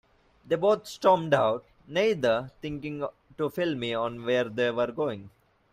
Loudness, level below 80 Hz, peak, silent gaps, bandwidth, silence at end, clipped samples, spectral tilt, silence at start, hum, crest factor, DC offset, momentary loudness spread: -28 LUFS; -62 dBFS; -8 dBFS; none; 15.5 kHz; 0.45 s; under 0.1%; -5.5 dB/octave; 0.45 s; none; 20 dB; under 0.1%; 12 LU